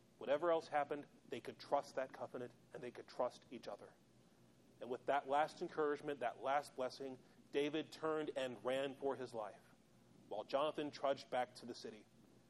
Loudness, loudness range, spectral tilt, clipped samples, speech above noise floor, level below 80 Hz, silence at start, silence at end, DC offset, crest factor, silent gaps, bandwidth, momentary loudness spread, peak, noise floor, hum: -43 LUFS; 5 LU; -5 dB/octave; under 0.1%; 26 dB; -86 dBFS; 0.2 s; 0.5 s; under 0.1%; 20 dB; none; 12.5 kHz; 13 LU; -24 dBFS; -69 dBFS; none